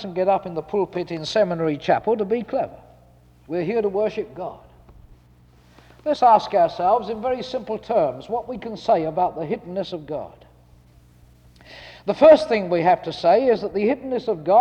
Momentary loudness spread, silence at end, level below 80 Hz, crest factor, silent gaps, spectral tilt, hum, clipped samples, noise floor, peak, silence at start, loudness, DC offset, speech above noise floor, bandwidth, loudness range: 15 LU; 0 s; -54 dBFS; 18 dB; none; -6.5 dB/octave; none; under 0.1%; -52 dBFS; -2 dBFS; 0 s; -21 LUFS; under 0.1%; 32 dB; 9 kHz; 9 LU